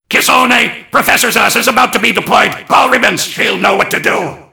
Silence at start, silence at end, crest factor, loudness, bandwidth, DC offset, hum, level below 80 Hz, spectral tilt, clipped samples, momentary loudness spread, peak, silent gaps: 0.1 s; 0.1 s; 10 dB; -10 LUFS; over 20 kHz; under 0.1%; none; -48 dBFS; -2 dB/octave; 1%; 5 LU; 0 dBFS; none